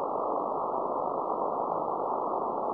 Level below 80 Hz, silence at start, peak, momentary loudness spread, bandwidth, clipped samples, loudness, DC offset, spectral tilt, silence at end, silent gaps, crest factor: -72 dBFS; 0 s; -16 dBFS; 1 LU; 5.4 kHz; under 0.1%; -31 LUFS; under 0.1%; -11 dB/octave; 0 s; none; 14 dB